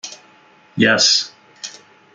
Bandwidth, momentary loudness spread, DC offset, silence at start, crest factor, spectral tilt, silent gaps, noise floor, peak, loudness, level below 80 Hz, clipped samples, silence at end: 11 kHz; 21 LU; under 0.1%; 0.05 s; 18 dB; -2 dB/octave; none; -50 dBFS; -2 dBFS; -14 LUFS; -64 dBFS; under 0.1%; 0.45 s